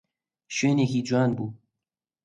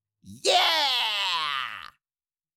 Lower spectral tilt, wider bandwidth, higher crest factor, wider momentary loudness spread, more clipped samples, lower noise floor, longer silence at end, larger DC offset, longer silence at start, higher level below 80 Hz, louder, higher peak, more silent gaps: first, -6 dB/octave vs 0 dB/octave; second, 9.4 kHz vs 17 kHz; about the same, 14 dB vs 18 dB; about the same, 10 LU vs 12 LU; neither; about the same, -88 dBFS vs under -90 dBFS; about the same, 0.7 s vs 0.75 s; neither; first, 0.5 s vs 0.25 s; first, -66 dBFS vs -74 dBFS; about the same, -25 LUFS vs -23 LUFS; about the same, -12 dBFS vs -10 dBFS; neither